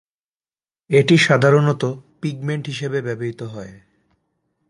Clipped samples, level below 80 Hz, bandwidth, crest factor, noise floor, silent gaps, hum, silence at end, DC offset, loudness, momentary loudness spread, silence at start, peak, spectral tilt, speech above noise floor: under 0.1%; -60 dBFS; 11.5 kHz; 20 dB; under -90 dBFS; none; none; 0.95 s; under 0.1%; -18 LUFS; 19 LU; 0.9 s; 0 dBFS; -6 dB/octave; over 72 dB